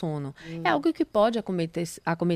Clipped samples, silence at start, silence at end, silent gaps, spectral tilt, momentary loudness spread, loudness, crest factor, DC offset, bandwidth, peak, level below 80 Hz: under 0.1%; 0 s; 0 s; none; -6 dB/octave; 9 LU; -27 LUFS; 20 dB; under 0.1%; 15 kHz; -8 dBFS; -60 dBFS